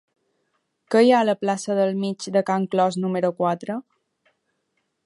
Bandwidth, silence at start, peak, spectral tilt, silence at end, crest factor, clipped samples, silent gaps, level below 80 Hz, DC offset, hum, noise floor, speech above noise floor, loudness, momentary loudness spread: 11.5 kHz; 0.9 s; -6 dBFS; -6 dB/octave; 1.25 s; 18 dB; under 0.1%; none; -76 dBFS; under 0.1%; none; -74 dBFS; 53 dB; -22 LUFS; 10 LU